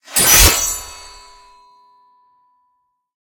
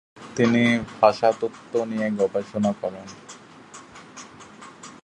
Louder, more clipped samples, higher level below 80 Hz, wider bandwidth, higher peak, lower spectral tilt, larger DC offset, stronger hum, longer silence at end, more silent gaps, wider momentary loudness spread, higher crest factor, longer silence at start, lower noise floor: first, -11 LUFS vs -23 LUFS; neither; first, -28 dBFS vs -60 dBFS; first, over 20 kHz vs 10 kHz; about the same, 0 dBFS vs -2 dBFS; second, -1 dB/octave vs -5.5 dB/octave; neither; neither; first, 2.35 s vs 0.05 s; neither; about the same, 26 LU vs 24 LU; about the same, 18 dB vs 22 dB; about the same, 0.1 s vs 0.15 s; first, -67 dBFS vs -45 dBFS